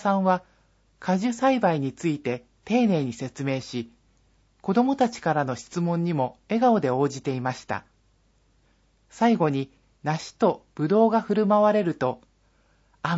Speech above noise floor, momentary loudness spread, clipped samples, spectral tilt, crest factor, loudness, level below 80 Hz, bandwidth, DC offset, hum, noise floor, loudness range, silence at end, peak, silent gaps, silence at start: 40 dB; 13 LU; under 0.1%; -7 dB/octave; 18 dB; -25 LUFS; -64 dBFS; 8 kHz; under 0.1%; none; -64 dBFS; 4 LU; 0 s; -8 dBFS; none; 0 s